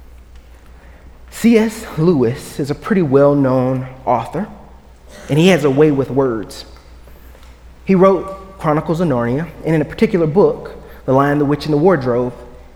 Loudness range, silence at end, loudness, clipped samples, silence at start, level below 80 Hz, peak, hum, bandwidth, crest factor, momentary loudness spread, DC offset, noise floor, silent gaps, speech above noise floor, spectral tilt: 3 LU; 0.15 s; -15 LUFS; under 0.1%; 0.35 s; -40 dBFS; 0 dBFS; none; 17.5 kHz; 16 dB; 13 LU; under 0.1%; -40 dBFS; none; 25 dB; -7 dB/octave